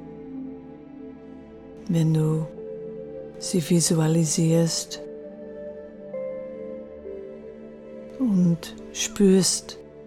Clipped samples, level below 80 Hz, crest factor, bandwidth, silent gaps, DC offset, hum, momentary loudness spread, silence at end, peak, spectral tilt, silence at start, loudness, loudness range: under 0.1%; -56 dBFS; 18 dB; 15 kHz; none; under 0.1%; none; 21 LU; 0 s; -8 dBFS; -5 dB/octave; 0 s; -23 LUFS; 9 LU